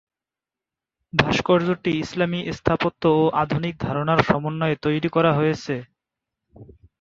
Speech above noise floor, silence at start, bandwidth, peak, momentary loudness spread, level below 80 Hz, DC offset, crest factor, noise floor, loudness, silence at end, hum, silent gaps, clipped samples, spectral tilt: 68 dB; 1.15 s; 7.6 kHz; 0 dBFS; 6 LU; -48 dBFS; under 0.1%; 22 dB; -89 dBFS; -22 LUFS; 0.35 s; none; none; under 0.1%; -6.5 dB/octave